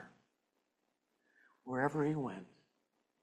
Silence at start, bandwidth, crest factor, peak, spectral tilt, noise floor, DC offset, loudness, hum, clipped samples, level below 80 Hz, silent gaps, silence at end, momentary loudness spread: 0 s; 11 kHz; 22 dB; -22 dBFS; -8 dB/octave; -84 dBFS; under 0.1%; -37 LUFS; none; under 0.1%; -80 dBFS; none; 0.75 s; 17 LU